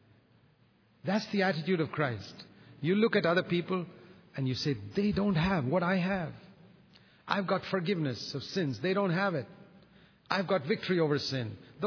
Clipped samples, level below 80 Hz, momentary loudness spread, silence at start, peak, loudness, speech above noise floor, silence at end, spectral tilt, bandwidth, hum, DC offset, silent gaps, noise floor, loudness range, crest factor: under 0.1%; -60 dBFS; 11 LU; 1.05 s; -12 dBFS; -31 LUFS; 35 dB; 0 s; -6.5 dB/octave; 5.4 kHz; none; under 0.1%; none; -66 dBFS; 2 LU; 20 dB